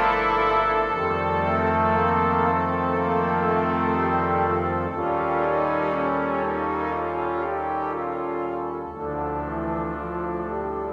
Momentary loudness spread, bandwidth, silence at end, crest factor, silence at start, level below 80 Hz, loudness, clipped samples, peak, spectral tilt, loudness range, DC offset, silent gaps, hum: 8 LU; 7.4 kHz; 0 s; 16 dB; 0 s; -44 dBFS; -24 LUFS; under 0.1%; -8 dBFS; -8.5 dB/octave; 6 LU; under 0.1%; none; none